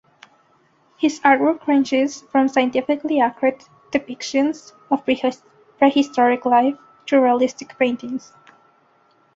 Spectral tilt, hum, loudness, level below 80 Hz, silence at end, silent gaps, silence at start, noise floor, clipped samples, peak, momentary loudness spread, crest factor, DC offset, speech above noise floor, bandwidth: -4 dB/octave; none; -19 LUFS; -66 dBFS; 1.2 s; none; 1 s; -59 dBFS; under 0.1%; -2 dBFS; 9 LU; 18 dB; under 0.1%; 40 dB; 7.8 kHz